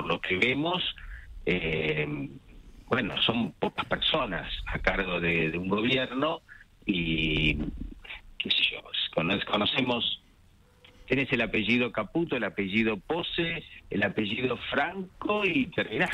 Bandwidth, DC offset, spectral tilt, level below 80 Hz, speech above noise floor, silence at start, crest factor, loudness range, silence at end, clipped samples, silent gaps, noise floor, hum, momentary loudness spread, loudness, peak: 11.5 kHz; under 0.1%; -6 dB/octave; -46 dBFS; 31 dB; 0 s; 20 dB; 2 LU; 0 s; under 0.1%; none; -59 dBFS; none; 10 LU; -28 LUFS; -10 dBFS